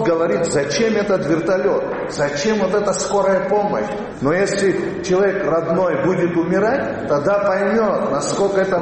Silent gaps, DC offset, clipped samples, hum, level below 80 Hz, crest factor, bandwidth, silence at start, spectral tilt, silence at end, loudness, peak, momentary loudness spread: none; under 0.1%; under 0.1%; none; -48 dBFS; 14 dB; 8.8 kHz; 0 s; -5 dB/octave; 0 s; -18 LUFS; -4 dBFS; 4 LU